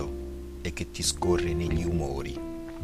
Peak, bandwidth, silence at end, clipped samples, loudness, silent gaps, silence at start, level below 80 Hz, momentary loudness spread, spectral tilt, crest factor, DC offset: -12 dBFS; 15.5 kHz; 0 s; under 0.1%; -30 LUFS; none; 0 s; -38 dBFS; 11 LU; -4.5 dB/octave; 18 dB; under 0.1%